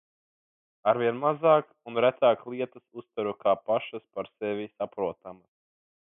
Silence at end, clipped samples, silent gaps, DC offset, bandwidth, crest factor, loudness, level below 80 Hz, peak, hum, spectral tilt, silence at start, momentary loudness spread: 0.7 s; under 0.1%; none; under 0.1%; 3.8 kHz; 20 dB; -28 LUFS; -74 dBFS; -10 dBFS; none; -9.5 dB/octave; 0.85 s; 15 LU